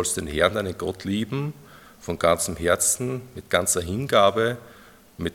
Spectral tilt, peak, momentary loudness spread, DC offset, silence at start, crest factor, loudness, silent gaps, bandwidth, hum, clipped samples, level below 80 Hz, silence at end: -3.5 dB/octave; -4 dBFS; 14 LU; under 0.1%; 0 s; 22 dB; -23 LUFS; none; 18 kHz; none; under 0.1%; -50 dBFS; 0 s